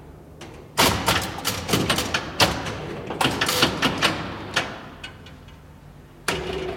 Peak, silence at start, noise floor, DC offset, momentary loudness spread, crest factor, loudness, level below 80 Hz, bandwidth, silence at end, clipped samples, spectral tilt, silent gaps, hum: -2 dBFS; 0 s; -45 dBFS; under 0.1%; 19 LU; 24 dB; -23 LUFS; -44 dBFS; 17 kHz; 0 s; under 0.1%; -3 dB/octave; none; none